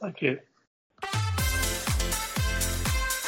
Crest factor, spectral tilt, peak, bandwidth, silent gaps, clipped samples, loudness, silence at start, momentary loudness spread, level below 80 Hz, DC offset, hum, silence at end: 18 dB; -3.5 dB/octave; -10 dBFS; 17 kHz; 0.67-0.90 s; under 0.1%; -28 LUFS; 0 s; 5 LU; -34 dBFS; under 0.1%; none; 0 s